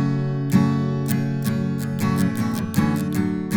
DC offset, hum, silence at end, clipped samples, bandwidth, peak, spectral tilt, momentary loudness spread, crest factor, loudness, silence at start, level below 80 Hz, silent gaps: under 0.1%; none; 0 s; under 0.1%; over 20 kHz; -4 dBFS; -7 dB/octave; 4 LU; 16 dB; -22 LUFS; 0 s; -52 dBFS; none